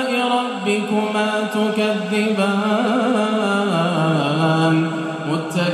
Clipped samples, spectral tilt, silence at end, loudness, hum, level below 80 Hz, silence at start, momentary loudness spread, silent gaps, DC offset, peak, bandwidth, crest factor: under 0.1%; -6 dB/octave; 0 s; -19 LUFS; none; -68 dBFS; 0 s; 3 LU; none; under 0.1%; -6 dBFS; 14 kHz; 12 dB